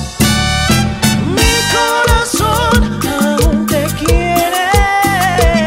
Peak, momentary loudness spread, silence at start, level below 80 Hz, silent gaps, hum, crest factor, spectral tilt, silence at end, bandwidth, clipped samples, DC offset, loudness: 0 dBFS; 3 LU; 0 s; -20 dBFS; none; none; 12 dB; -4 dB/octave; 0 s; 16.5 kHz; under 0.1%; under 0.1%; -12 LUFS